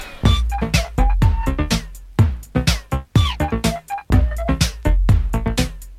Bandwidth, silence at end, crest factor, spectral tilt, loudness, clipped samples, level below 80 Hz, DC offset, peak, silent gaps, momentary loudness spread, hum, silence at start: 15.5 kHz; 0 s; 16 dB; -5.5 dB/octave; -20 LUFS; under 0.1%; -20 dBFS; under 0.1%; -2 dBFS; none; 5 LU; none; 0 s